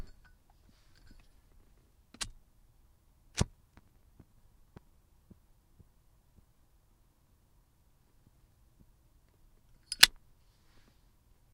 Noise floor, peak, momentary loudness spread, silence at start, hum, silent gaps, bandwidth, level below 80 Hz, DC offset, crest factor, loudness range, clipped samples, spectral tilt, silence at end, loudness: -67 dBFS; 0 dBFS; 20 LU; 2.2 s; none; none; 16 kHz; -56 dBFS; under 0.1%; 40 dB; 16 LU; under 0.1%; -1 dB/octave; 1.45 s; -28 LUFS